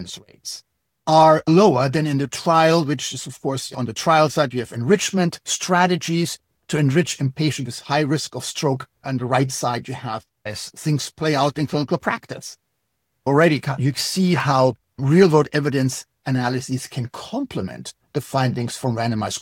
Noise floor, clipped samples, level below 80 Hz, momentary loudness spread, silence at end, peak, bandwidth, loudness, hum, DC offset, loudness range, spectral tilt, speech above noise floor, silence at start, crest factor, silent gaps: -74 dBFS; under 0.1%; -58 dBFS; 14 LU; 0 s; -2 dBFS; 17 kHz; -20 LUFS; none; under 0.1%; 7 LU; -5 dB/octave; 54 dB; 0 s; 20 dB; none